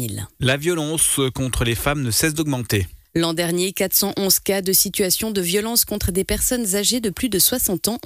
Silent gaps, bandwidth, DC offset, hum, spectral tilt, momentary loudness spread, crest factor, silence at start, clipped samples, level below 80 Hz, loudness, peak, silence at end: none; 16 kHz; under 0.1%; none; -3 dB/octave; 6 LU; 16 dB; 0 s; under 0.1%; -38 dBFS; -19 LUFS; -4 dBFS; 0.05 s